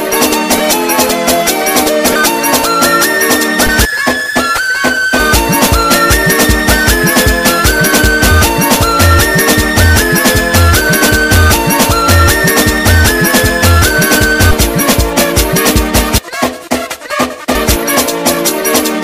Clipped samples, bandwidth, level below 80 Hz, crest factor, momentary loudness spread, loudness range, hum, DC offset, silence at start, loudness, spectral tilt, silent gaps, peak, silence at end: under 0.1%; 16.5 kHz; -20 dBFS; 10 dB; 4 LU; 3 LU; none; 0.5%; 0 s; -9 LUFS; -3.5 dB/octave; none; 0 dBFS; 0 s